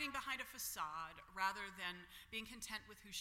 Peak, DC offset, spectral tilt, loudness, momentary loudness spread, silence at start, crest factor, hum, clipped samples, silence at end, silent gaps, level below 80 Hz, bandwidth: -26 dBFS; under 0.1%; -1 dB/octave; -46 LUFS; 8 LU; 0 s; 22 dB; none; under 0.1%; 0 s; none; -70 dBFS; 16.5 kHz